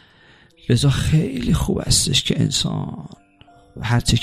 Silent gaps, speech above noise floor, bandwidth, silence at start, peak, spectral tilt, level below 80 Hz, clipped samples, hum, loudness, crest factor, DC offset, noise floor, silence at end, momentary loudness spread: none; 32 dB; 15.5 kHz; 0.7 s; -4 dBFS; -4.5 dB/octave; -32 dBFS; under 0.1%; none; -19 LUFS; 16 dB; under 0.1%; -51 dBFS; 0 s; 14 LU